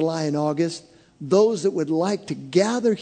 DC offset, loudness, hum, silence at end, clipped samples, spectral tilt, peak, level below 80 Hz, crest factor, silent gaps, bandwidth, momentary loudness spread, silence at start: under 0.1%; -22 LUFS; none; 0 s; under 0.1%; -6 dB/octave; -4 dBFS; -68 dBFS; 18 dB; none; 9.4 kHz; 9 LU; 0 s